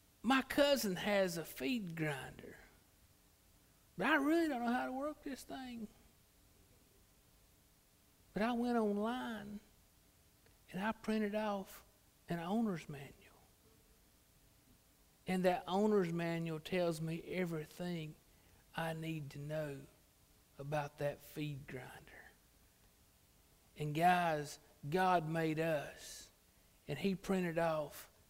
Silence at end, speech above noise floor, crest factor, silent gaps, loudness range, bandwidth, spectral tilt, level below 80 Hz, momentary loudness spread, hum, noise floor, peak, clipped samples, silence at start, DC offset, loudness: 0.25 s; 32 dB; 22 dB; none; 9 LU; 16 kHz; -5.5 dB/octave; -68 dBFS; 18 LU; none; -70 dBFS; -18 dBFS; under 0.1%; 0.25 s; under 0.1%; -38 LUFS